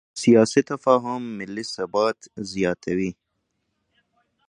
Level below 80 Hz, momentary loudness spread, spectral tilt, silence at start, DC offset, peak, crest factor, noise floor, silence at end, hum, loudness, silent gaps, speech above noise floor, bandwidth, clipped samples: -60 dBFS; 14 LU; -5.5 dB/octave; 0.15 s; under 0.1%; -2 dBFS; 20 dB; -75 dBFS; 1.35 s; none; -22 LUFS; none; 53 dB; 10.5 kHz; under 0.1%